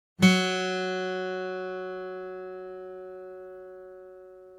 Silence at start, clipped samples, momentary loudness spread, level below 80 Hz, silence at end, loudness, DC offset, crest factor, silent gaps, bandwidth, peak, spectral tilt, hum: 0.2 s; under 0.1%; 24 LU; -68 dBFS; 0 s; -28 LUFS; under 0.1%; 24 dB; none; 14 kHz; -6 dBFS; -5 dB/octave; none